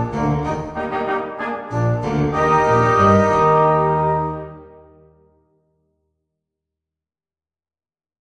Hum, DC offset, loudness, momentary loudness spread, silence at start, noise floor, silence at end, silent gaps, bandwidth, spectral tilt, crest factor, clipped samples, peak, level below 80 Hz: none; under 0.1%; -17 LUFS; 12 LU; 0 s; under -90 dBFS; 3.55 s; none; 9.8 kHz; -7.5 dB/octave; 18 dB; under 0.1%; -2 dBFS; -42 dBFS